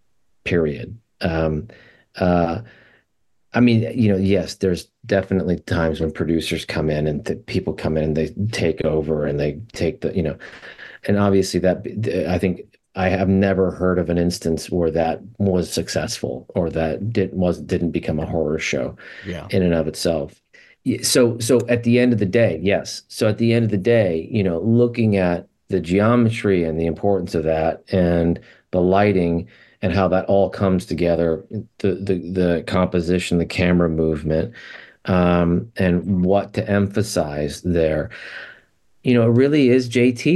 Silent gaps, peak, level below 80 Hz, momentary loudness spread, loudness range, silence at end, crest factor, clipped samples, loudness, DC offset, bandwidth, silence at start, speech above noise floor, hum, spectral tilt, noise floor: none; -4 dBFS; -46 dBFS; 10 LU; 4 LU; 0 s; 16 dB; under 0.1%; -20 LUFS; under 0.1%; 12.5 kHz; 0.45 s; 50 dB; none; -6.5 dB/octave; -70 dBFS